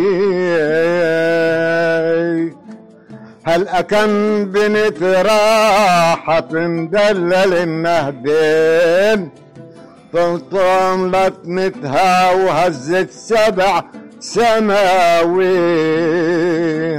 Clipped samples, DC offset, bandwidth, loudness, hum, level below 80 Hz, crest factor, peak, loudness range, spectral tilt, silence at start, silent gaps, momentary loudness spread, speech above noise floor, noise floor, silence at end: under 0.1%; 1%; 16 kHz; -14 LUFS; none; -48 dBFS; 8 dB; -6 dBFS; 3 LU; -5 dB/octave; 0 s; none; 7 LU; 25 dB; -39 dBFS; 0 s